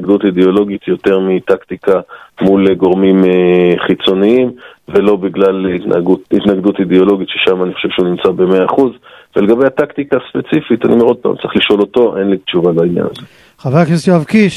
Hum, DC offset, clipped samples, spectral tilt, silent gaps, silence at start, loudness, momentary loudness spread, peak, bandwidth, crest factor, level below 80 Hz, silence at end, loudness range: none; under 0.1%; under 0.1%; -7.5 dB/octave; none; 0 s; -12 LUFS; 6 LU; 0 dBFS; 11.5 kHz; 12 dB; -46 dBFS; 0 s; 2 LU